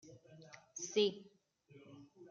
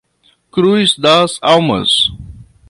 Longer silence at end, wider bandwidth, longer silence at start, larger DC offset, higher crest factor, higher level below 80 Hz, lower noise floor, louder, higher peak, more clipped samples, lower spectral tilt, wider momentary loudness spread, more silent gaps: second, 0.05 s vs 0.25 s; second, 7.6 kHz vs 11.5 kHz; second, 0.05 s vs 0.55 s; neither; first, 22 dB vs 14 dB; second, -88 dBFS vs -42 dBFS; first, -66 dBFS vs -56 dBFS; second, -37 LUFS vs -12 LUFS; second, -22 dBFS vs 0 dBFS; neither; about the same, -3 dB/octave vs -4 dB/octave; first, 24 LU vs 5 LU; neither